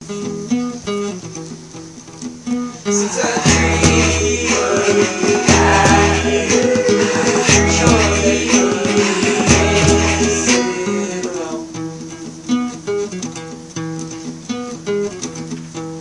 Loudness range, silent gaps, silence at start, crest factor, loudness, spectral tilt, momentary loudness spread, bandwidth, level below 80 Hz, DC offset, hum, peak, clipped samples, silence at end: 11 LU; none; 0 s; 16 dB; -15 LUFS; -4 dB/octave; 17 LU; 11.5 kHz; -34 dBFS; under 0.1%; none; 0 dBFS; under 0.1%; 0 s